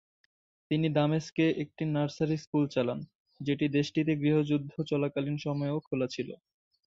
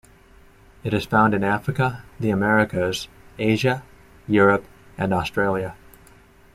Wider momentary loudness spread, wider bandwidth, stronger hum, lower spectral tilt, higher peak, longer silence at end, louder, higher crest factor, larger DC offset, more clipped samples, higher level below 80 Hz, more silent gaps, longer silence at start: second, 8 LU vs 12 LU; second, 7.6 kHz vs 15 kHz; neither; about the same, -7.5 dB/octave vs -6.5 dB/octave; second, -14 dBFS vs -4 dBFS; second, 0.5 s vs 0.8 s; second, -30 LUFS vs -22 LUFS; about the same, 18 dB vs 18 dB; neither; neither; second, -68 dBFS vs -50 dBFS; first, 1.32-1.36 s, 2.47-2.53 s, 3.15-3.26 s, 5.87-5.91 s vs none; second, 0.7 s vs 0.85 s